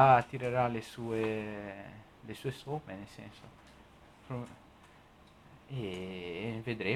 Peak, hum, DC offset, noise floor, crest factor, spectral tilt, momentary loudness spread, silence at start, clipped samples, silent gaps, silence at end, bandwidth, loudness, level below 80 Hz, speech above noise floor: -12 dBFS; none; under 0.1%; -59 dBFS; 22 dB; -6.5 dB/octave; 19 LU; 0 s; under 0.1%; none; 0 s; 14.5 kHz; -36 LUFS; -64 dBFS; 26 dB